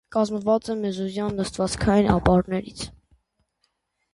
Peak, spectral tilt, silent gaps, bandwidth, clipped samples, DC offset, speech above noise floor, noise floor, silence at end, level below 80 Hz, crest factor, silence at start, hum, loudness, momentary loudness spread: -4 dBFS; -6 dB/octave; none; 11.5 kHz; under 0.1%; under 0.1%; 50 dB; -73 dBFS; 1.25 s; -40 dBFS; 20 dB; 0.1 s; none; -23 LUFS; 11 LU